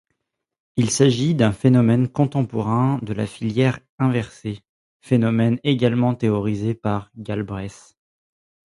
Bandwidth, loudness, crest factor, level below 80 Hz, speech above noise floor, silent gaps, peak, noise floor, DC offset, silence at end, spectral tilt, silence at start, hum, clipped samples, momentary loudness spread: 11.5 kHz; -20 LUFS; 18 dB; -52 dBFS; 56 dB; 3.89-3.98 s, 4.69-5.00 s; -2 dBFS; -76 dBFS; under 0.1%; 1 s; -6.5 dB/octave; 0.75 s; none; under 0.1%; 12 LU